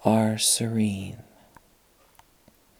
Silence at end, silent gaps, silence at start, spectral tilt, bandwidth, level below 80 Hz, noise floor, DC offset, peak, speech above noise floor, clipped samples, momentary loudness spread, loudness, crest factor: 1.6 s; none; 0 s; -4 dB/octave; over 20 kHz; -64 dBFS; -60 dBFS; under 0.1%; -4 dBFS; 36 dB; under 0.1%; 18 LU; -23 LUFS; 22 dB